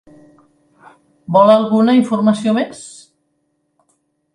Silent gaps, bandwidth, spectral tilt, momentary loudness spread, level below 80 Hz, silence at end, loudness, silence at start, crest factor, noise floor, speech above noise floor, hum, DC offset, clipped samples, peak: none; 11 kHz; -6.5 dB/octave; 17 LU; -64 dBFS; 1.45 s; -13 LUFS; 1.3 s; 16 dB; -67 dBFS; 54 dB; none; under 0.1%; under 0.1%; 0 dBFS